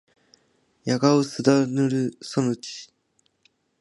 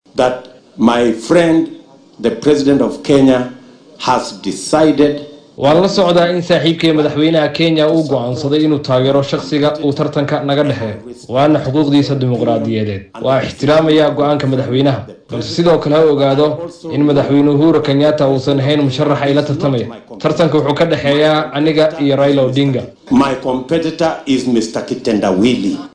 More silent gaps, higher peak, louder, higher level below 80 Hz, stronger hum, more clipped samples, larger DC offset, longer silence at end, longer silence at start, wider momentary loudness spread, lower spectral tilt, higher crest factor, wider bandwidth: neither; second, -4 dBFS vs 0 dBFS; second, -23 LUFS vs -13 LUFS; second, -70 dBFS vs -46 dBFS; neither; neither; neither; first, 0.95 s vs 0.05 s; first, 0.85 s vs 0.15 s; first, 15 LU vs 9 LU; about the same, -6 dB/octave vs -6.5 dB/octave; first, 20 dB vs 12 dB; about the same, 11.5 kHz vs 10.5 kHz